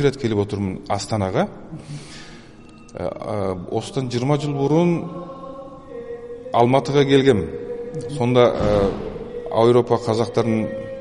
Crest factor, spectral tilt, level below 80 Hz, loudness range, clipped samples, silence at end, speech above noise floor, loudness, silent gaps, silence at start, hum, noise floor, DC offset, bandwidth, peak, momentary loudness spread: 18 dB; -7 dB/octave; -44 dBFS; 8 LU; under 0.1%; 0 s; 23 dB; -20 LUFS; none; 0 s; none; -43 dBFS; under 0.1%; 11.5 kHz; -2 dBFS; 19 LU